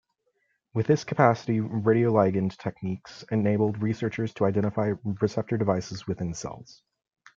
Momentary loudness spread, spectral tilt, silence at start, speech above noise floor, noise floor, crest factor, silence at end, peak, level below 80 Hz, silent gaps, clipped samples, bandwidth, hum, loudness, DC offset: 12 LU; -7.5 dB/octave; 0.75 s; 48 dB; -74 dBFS; 22 dB; 0.65 s; -4 dBFS; -62 dBFS; none; under 0.1%; 7.6 kHz; none; -26 LUFS; under 0.1%